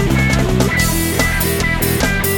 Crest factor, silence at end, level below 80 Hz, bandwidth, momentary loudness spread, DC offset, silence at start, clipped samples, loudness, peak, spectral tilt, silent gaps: 14 dB; 0 s; -24 dBFS; 17.5 kHz; 1 LU; under 0.1%; 0 s; under 0.1%; -15 LUFS; 0 dBFS; -4.5 dB/octave; none